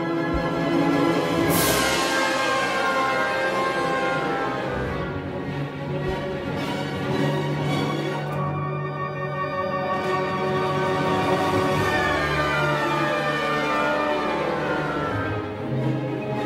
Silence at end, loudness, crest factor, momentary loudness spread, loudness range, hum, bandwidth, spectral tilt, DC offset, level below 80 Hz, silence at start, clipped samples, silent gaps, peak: 0 s; -23 LUFS; 16 dB; 7 LU; 5 LU; none; 16 kHz; -5 dB/octave; under 0.1%; -46 dBFS; 0 s; under 0.1%; none; -8 dBFS